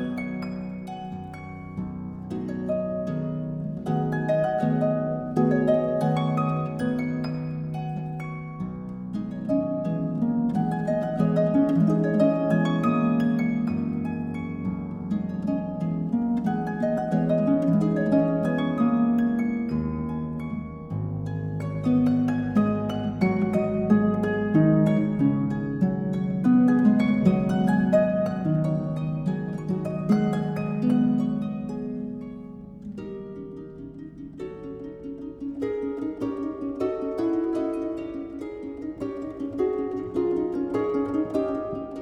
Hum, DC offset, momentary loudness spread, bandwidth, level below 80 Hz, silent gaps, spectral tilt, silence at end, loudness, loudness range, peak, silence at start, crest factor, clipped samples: none; under 0.1%; 14 LU; 9.6 kHz; -52 dBFS; none; -9.5 dB/octave; 0 s; -25 LUFS; 9 LU; -8 dBFS; 0 s; 18 dB; under 0.1%